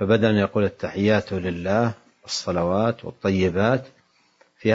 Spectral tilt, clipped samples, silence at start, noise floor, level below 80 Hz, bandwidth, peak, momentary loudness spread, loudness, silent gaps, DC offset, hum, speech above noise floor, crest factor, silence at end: -6 dB/octave; under 0.1%; 0 s; -60 dBFS; -58 dBFS; 8 kHz; -4 dBFS; 7 LU; -23 LUFS; none; under 0.1%; none; 39 dB; 18 dB; 0 s